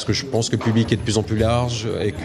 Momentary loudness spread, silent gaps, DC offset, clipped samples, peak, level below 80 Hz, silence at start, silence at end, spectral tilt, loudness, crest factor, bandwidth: 4 LU; none; under 0.1%; under 0.1%; -4 dBFS; -40 dBFS; 0 s; 0 s; -5.5 dB/octave; -21 LUFS; 16 dB; 12 kHz